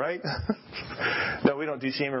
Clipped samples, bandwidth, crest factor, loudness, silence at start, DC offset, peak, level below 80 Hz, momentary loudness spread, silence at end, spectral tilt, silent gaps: under 0.1%; 5.8 kHz; 22 dB; -29 LUFS; 0 s; under 0.1%; -6 dBFS; -50 dBFS; 7 LU; 0 s; -9 dB/octave; none